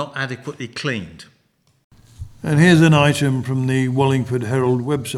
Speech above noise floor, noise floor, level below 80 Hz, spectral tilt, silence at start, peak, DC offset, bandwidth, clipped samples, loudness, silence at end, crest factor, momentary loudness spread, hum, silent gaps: 44 dB; -62 dBFS; -50 dBFS; -6 dB/octave; 0 s; -2 dBFS; under 0.1%; 13.5 kHz; under 0.1%; -17 LUFS; 0 s; 16 dB; 17 LU; none; 1.84-1.90 s